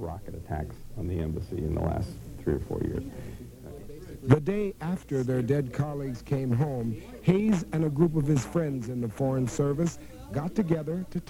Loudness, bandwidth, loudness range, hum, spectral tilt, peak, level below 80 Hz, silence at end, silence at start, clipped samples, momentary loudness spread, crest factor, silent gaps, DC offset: -29 LUFS; 16.5 kHz; 6 LU; none; -8 dB/octave; -2 dBFS; -46 dBFS; 0 s; 0 s; under 0.1%; 15 LU; 26 dB; none; under 0.1%